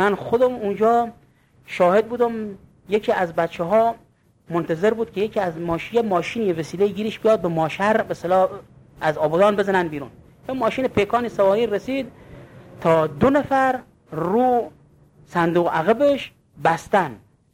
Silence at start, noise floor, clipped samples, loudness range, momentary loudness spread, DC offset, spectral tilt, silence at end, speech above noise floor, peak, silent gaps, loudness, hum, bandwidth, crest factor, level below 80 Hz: 0 s; -52 dBFS; under 0.1%; 2 LU; 11 LU; under 0.1%; -6.5 dB/octave; 0.35 s; 32 dB; -4 dBFS; none; -21 LUFS; none; 16.5 kHz; 18 dB; -52 dBFS